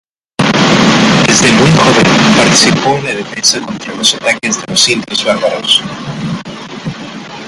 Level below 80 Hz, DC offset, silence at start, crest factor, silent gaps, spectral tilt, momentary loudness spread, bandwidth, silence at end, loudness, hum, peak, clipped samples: -42 dBFS; under 0.1%; 0.4 s; 10 dB; none; -3.5 dB/octave; 16 LU; 16 kHz; 0 s; -9 LUFS; none; 0 dBFS; 0.2%